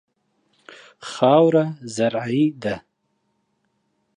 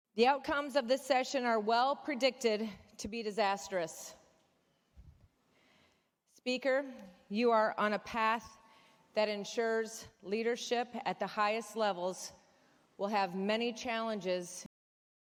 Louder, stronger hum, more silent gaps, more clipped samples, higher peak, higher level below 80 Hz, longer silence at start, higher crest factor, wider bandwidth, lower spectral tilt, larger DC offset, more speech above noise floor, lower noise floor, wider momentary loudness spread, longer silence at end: first, -20 LUFS vs -34 LUFS; neither; neither; neither; first, -4 dBFS vs -16 dBFS; first, -64 dBFS vs -72 dBFS; first, 1 s vs 0.15 s; about the same, 20 dB vs 20 dB; second, 11 kHz vs 18.5 kHz; first, -6.5 dB/octave vs -3.5 dB/octave; neither; first, 52 dB vs 41 dB; second, -71 dBFS vs -75 dBFS; first, 18 LU vs 13 LU; first, 1.35 s vs 0.55 s